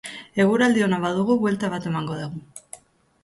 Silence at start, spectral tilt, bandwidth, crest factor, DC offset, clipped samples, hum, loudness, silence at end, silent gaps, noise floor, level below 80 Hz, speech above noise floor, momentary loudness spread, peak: 0.05 s; -6 dB/octave; 11.5 kHz; 16 dB; under 0.1%; under 0.1%; none; -22 LUFS; 0.45 s; none; -47 dBFS; -60 dBFS; 25 dB; 22 LU; -8 dBFS